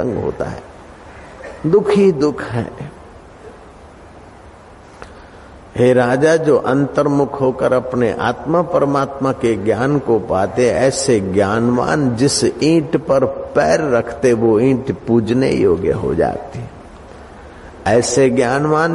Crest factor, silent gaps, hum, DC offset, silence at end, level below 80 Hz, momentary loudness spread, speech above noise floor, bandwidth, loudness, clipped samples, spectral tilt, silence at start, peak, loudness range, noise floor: 14 dB; none; none; under 0.1%; 0 s; -42 dBFS; 11 LU; 25 dB; 11.5 kHz; -15 LUFS; under 0.1%; -5.5 dB/octave; 0 s; -2 dBFS; 4 LU; -40 dBFS